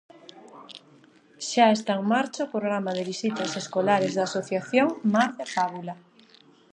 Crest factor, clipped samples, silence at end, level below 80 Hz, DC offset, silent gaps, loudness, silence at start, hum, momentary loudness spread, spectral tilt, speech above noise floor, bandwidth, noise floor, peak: 20 dB; under 0.1%; 0.8 s; -78 dBFS; under 0.1%; none; -25 LUFS; 0.35 s; none; 18 LU; -4.5 dB/octave; 31 dB; 10 kHz; -56 dBFS; -6 dBFS